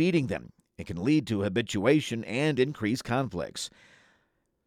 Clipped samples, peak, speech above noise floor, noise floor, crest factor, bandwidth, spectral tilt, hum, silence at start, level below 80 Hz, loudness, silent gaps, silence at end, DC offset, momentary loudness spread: under 0.1%; -10 dBFS; 46 dB; -73 dBFS; 20 dB; 14.5 kHz; -6 dB/octave; none; 0 s; -60 dBFS; -28 LUFS; none; 1 s; under 0.1%; 12 LU